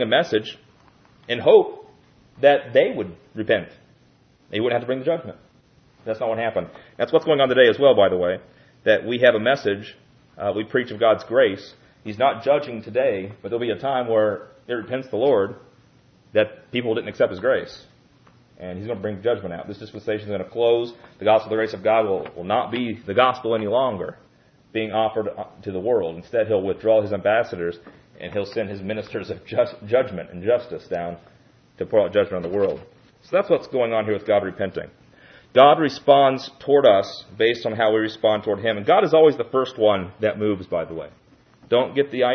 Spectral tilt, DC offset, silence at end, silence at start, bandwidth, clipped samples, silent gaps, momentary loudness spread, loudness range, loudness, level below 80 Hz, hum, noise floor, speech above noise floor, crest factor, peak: -6.5 dB/octave; under 0.1%; 0 s; 0 s; 6.6 kHz; under 0.1%; none; 15 LU; 7 LU; -21 LUFS; -62 dBFS; none; -57 dBFS; 36 dB; 20 dB; 0 dBFS